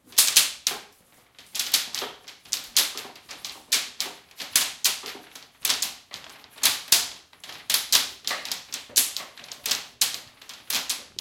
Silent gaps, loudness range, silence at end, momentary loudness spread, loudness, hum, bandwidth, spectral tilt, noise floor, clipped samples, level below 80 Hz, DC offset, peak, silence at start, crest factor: none; 3 LU; 0.15 s; 20 LU; -24 LUFS; none; 17 kHz; 2.5 dB/octave; -58 dBFS; under 0.1%; -70 dBFS; under 0.1%; 0 dBFS; 0.1 s; 28 dB